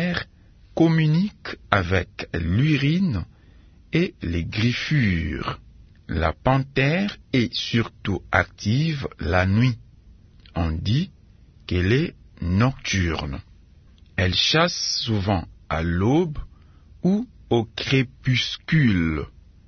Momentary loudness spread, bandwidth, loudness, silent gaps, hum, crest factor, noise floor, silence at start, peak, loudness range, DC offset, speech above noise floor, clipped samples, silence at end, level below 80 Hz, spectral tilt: 11 LU; 6.6 kHz; -23 LUFS; none; none; 22 dB; -51 dBFS; 0 s; 0 dBFS; 3 LU; under 0.1%; 29 dB; under 0.1%; 0.4 s; -42 dBFS; -6 dB/octave